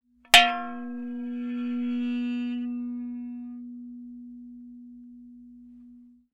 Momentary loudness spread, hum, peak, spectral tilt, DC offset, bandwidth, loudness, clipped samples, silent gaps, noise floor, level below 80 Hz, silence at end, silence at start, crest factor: 28 LU; none; -2 dBFS; -1 dB/octave; under 0.1%; 13.5 kHz; -25 LUFS; under 0.1%; none; -52 dBFS; -62 dBFS; 0.25 s; 0.35 s; 28 dB